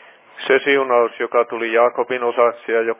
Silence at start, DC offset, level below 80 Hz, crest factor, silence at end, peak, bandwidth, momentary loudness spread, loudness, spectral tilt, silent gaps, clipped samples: 0.35 s; under 0.1%; -80 dBFS; 16 dB; 0.05 s; -2 dBFS; 3.9 kHz; 5 LU; -17 LUFS; -7 dB/octave; none; under 0.1%